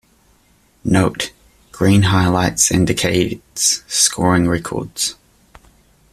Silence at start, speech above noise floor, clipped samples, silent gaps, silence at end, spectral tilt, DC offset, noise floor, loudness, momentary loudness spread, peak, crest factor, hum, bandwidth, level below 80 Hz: 0.85 s; 39 dB; under 0.1%; none; 1 s; -4 dB/octave; under 0.1%; -55 dBFS; -16 LUFS; 9 LU; 0 dBFS; 18 dB; none; 14.5 kHz; -42 dBFS